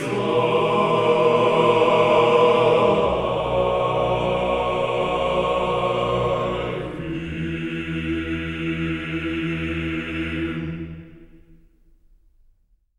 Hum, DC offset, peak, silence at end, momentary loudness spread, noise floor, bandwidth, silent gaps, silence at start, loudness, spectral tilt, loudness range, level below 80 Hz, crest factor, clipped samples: none; under 0.1%; -4 dBFS; 1.6 s; 11 LU; -60 dBFS; 11 kHz; none; 0 s; -21 LUFS; -6.5 dB/octave; 10 LU; -42 dBFS; 18 dB; under 0.1%